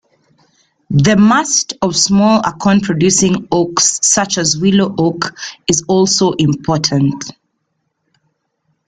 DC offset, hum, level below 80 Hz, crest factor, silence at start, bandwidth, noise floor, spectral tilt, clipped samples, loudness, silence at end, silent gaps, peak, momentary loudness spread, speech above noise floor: under 0.1%; none; -46 dBFS; 14 dB; 0.9 s; 9.6 kHz; -68 dBFS; -4 dB/octave; under 0.1%; -12 LUFS; 1.55 s; none; 0 dBFS; 7 LU; 56 dB